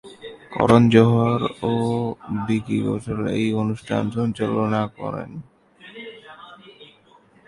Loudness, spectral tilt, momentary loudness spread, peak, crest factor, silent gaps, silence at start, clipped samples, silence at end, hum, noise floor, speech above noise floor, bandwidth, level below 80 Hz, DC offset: -21 LUFS; -7.5 dB/octave; 24 LU; 0 dBFS; 22 dB; none; 0.05 s; under 0.1%; 0.65 s; none; -54 dBFS; 34 dB; 11.5 kHz; -52 dBFS; under 0.1%